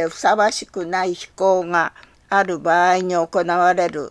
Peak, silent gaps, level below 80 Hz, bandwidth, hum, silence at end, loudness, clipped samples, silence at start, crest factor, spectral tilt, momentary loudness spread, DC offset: -2 dBFS; none; -58 dBFS; 11 kHz; none; 0 s; -19 LUFS; under 0.1%; 0 s; 16 dB; -4 dB/octave; 7 LU; under 0.1%